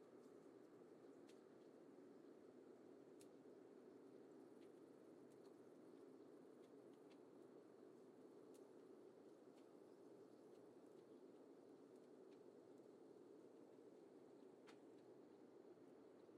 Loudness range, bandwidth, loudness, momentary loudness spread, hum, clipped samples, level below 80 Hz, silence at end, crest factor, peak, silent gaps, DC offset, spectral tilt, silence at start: 1 LU; 11 kHz; -66 LUFS; 1 LU; none; under 0.1%; under -90 dBFS; 0 s; 14 dB; -52 dBFS; none; under 0.1%; -6 dB/octave; 0 s